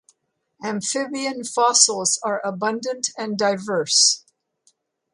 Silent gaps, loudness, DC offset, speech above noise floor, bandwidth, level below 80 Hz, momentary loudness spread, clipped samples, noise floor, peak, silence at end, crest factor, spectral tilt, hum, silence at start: none; -20 LUFS; under 0.1%; 48 dB; 11.5 kHz; -74 dBFS; 11 LU; under 0.1%; -69 dBFS; 0 dBFS; 0.95 s; 22 dB; -1 dB/octave; none; 0.6 s